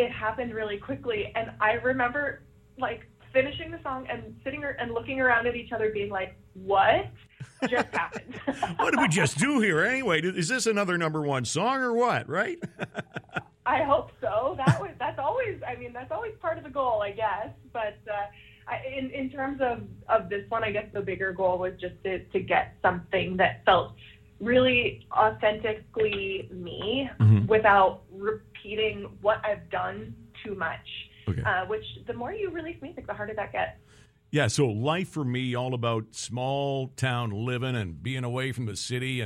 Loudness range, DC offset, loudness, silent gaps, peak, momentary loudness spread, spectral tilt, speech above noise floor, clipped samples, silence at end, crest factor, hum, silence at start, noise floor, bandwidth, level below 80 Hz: 7 LU; under 0.1%; -28 LUFS; none; -8 dBFS; 13 LU; -5 dB/octave; 29 dB; under 0.1%; 0 s; 20 dB; none; 0 s; -57 dBFS; 13.5 kHz; -56 dBFS